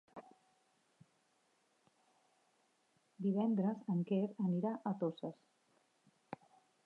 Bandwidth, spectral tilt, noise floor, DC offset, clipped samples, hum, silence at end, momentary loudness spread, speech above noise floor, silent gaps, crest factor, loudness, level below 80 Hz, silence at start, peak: 4.7 kHz; -10 dB/octave; -77 dBFS; under 0.1%; under 0.1%; none; 0.5 s; 19 LU; 40 dB; none; 16 dB; -38 LUFS; under -90 dBFS; 0.15 s; -26 dBFS